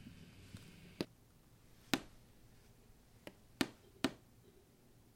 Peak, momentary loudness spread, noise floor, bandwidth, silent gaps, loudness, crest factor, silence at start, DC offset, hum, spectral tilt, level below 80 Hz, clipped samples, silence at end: -10 dBFS; 26 LU; -66 dBFS; 16.5 kHz; none; -44 LUFS; 38 dB; 0 s; under 0.1%; none; -3.5 dB/octave; -68 dBFS; under 0.1%; 0.05 s